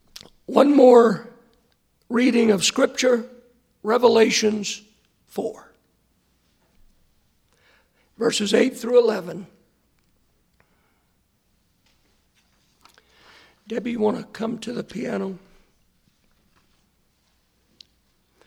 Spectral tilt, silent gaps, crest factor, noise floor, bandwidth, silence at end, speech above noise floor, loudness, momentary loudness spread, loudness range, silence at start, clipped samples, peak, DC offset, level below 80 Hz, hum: -4 dB/octave; none; 22 dB; -66 dBFS; 15 kHz; 3.1 s; 47 dB; -20 LUFS; 18 LU; 18 LU; 0.5 s; under 0.1%; -2 dBFS; under 0.1%; -66 dBFS; none